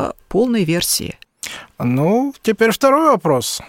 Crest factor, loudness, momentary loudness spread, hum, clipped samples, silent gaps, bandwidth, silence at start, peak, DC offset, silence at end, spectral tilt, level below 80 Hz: 16 dB; -16 LUFS; 16 LU; none; under 0.1%; none; 17 kHz; 0 s; -2 dBFS; under 0.1%; 0 s; -4.5 dB/octave; -48 dBFS